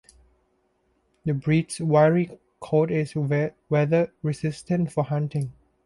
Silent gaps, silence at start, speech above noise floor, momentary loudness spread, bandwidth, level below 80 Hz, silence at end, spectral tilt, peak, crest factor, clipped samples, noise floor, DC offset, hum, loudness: none; 1.25 s; 45 dB; 11 LU; 11.5 kHz; -58 dBFS; 0.35 s; -7.5 dB/octave; -6 dBFS; 18 dB; under 0.1%; -69 dBFS; under 0.1%; none; -24 LUFS